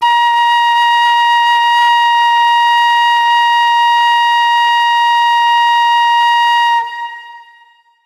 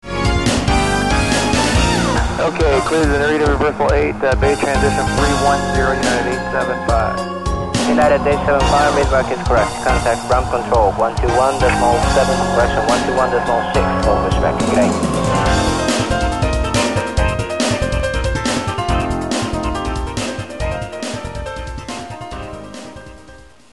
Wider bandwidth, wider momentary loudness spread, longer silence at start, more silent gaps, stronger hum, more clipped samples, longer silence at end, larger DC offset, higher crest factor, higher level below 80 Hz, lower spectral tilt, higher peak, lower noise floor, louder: about the same, 13 kHz vs 12 kHz; second, 1 LU vs 10 LU; about the same, 0 s vs 0.05 s; neither; neither; neither; first, 0.65 s vs 0.3 s; second, under 0.1% vs 0.5%; second, 6 dB vs 14 dB; second, -76 dBFS vs -24 dBFS; second, 4.5 dB/octave vs -5 dB/octave; about the same, -4 dBFS vs -2 dBFS; first, -47 dBFS vs -42 dBFS; first, -10 LUFS vs -16 LUFS